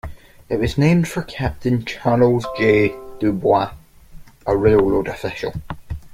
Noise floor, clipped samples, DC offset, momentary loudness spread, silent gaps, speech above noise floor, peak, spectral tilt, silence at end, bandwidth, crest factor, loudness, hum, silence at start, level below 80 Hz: -40 dBFS; under 0.1%; under 0.1%; 13 LU; none; 23 dB; -2 dBFS; -7.5 dB/octave; 0 s; 16 kHz; 16 dB; -19 LUFS; none; 0.05 s; -38 dBFS